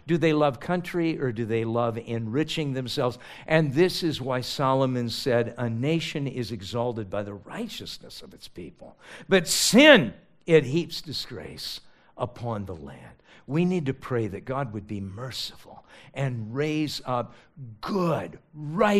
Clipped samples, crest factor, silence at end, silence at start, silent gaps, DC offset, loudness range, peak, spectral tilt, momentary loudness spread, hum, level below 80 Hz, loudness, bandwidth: under 0.1%; 26 dB; 0 s; 0.05 s; none; under 0.1%; 10 LU; 0 dBFS; -5 dB/octave; 18 LU; none; -56 dBFS; -25 LUFS; 15.5 kHz